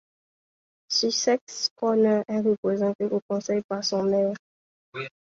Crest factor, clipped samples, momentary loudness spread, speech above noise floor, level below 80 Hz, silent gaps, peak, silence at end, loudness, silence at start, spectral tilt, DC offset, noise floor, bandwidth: 16 dB; under 0.1%; 14 LU; over 66 dB; -70 dBFS; 1.41-1.47 s, 1.71-1.76 s, 2.58-2.63 s, 2.95-2.99 s, 3.22-3.29 s, 3.64-3.69 s, 4.39-4.92 s; -10 dBFS; 0.3 s; -25 LUFS; 0.9 s; -4 dB/octave; under 0.1%; under -90 dBFS; 7.8 kHz